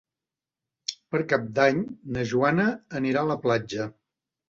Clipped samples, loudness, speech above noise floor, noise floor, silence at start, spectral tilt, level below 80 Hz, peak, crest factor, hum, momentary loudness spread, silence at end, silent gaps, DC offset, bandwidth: under 0.1%; -26 LUFS; 65 dB; -90 dBFS; 0.9 s; -6 dB/octave; -60 dBFS; -6 dBFS; 20 dB; none; 12 LU; 0.6 s; none; under 0.1%; 7.8 kHz